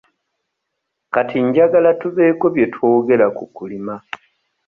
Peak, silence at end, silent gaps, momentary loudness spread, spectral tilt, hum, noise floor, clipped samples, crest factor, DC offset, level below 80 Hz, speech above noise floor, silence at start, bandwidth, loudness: -2 dBFS; 0.7 s; none; 17 LU; -9 dB/octave; none; -76 dBFS; under 0.1%; 16 dB; under 0.1%; -60 dBFS; 61 dB; 1.15 s; 4 kHz; -15 LUFS